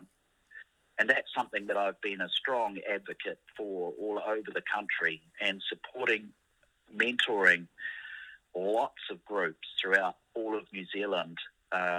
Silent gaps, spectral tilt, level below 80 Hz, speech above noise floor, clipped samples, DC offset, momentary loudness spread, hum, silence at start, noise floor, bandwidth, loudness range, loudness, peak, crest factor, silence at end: none; -3.5 dB/octave; -78 dBFS; 37 dB; under 0.1%; under 0.1%; 14 LU; none; 0 s; -70 dBFS; 13.5 kHz; 4 LU; -32 LUFS; -10 dBFS; 24 dB; 0 s